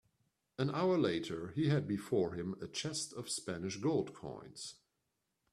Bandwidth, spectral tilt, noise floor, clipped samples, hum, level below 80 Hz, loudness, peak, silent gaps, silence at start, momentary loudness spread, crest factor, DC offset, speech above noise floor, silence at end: 13 kHz; -5.5 dB/octave; -85 dBFS; under 0.1%; none; -72 dBFS; -37 LUFS; -20 dBFS; none; 0.6 s; 15 LU; 18 dB; under 0.1%; 48 dB; 0.8 s